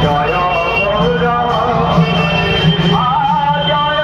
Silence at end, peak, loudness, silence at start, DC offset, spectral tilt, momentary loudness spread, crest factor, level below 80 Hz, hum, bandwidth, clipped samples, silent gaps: 0 s; 0 dBFS; -13 LUFS; 0 s; under 0.1%; -6.5 dB/octave; 2 LU; 12 dB; -30 dBFS; none; 7.2 kHz; under 0.1%; none